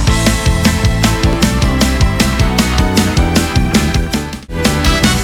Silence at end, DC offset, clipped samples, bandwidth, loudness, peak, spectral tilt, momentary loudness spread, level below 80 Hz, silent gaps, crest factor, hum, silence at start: 0 s; under 0.1%; under 0.1%; 20 kHz; -13 LUFS; 0 dBFS; -4.5 dB/octave; 3 LU; -18 dBFS; none; 12 dB; none; 0 s